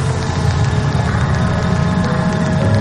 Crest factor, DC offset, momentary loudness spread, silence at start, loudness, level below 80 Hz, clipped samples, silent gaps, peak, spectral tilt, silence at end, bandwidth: 12 dB; under 0.1%; 1 LU; 0 s; -16 LUFS; -28 dBFS; under 0.1%; none; -4 dBFS; -6.5 dB/octave; 0 s; 11 kHz